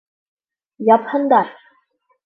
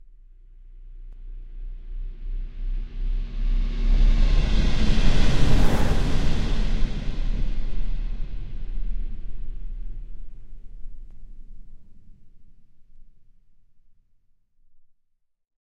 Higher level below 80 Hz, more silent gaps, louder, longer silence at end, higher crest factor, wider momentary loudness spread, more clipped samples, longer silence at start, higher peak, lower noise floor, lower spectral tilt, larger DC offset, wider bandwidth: second, -72 dBFS vs -24 dBFS; neither; first, -16 LUFS vs -28 LUFS; second, 0.75 s vs 2.6 s; about the same, 18 dB vs 16 dB; second, 8 LU vs 24 LU; neither; about the same, 0.8 s vs 0.7 s; about the same, -2 dBFS vs -4 dBFS; second, -63 dBFS vs -67 dBFS; first, -9 dB/octave vs -6 dB/octave; neither; second, 5 kHz vs 8 kHz